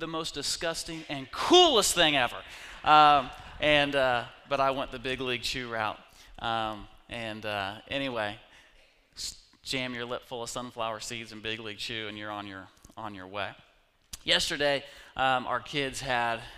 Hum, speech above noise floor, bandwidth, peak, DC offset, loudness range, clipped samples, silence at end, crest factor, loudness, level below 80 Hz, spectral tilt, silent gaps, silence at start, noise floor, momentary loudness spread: none; 32 dB; 15.5 kHz; -6 dBFS; under 0.1%; 13 LU; under 0.1%; 0 s; 24 dB; -28 LUFS; -54 dBFS; -2.5 dB/octave; none; 0 s; -61 dBFS; 17 LU